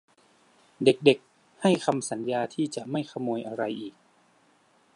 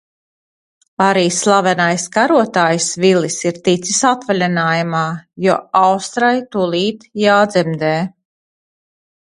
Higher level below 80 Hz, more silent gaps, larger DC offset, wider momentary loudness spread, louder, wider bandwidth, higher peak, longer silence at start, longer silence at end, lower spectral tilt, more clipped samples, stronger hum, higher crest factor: second, -76 dBFS vs -60 dBFS; neither; neither; first, 10 LU vs 6 LU; second, -27 LUFS vs -15 LUFS; about the same, 11.5 kHz vs 11.5 kHz; second, -4 dBFS vs 0 dBFS; second, 0.8 s vs 1 s; about the same, 1.05 s vs 1.15 s; about the same, -5 dB/octave vs -4 dB/octave; neither; neither; first, 24 dB vs 16 dB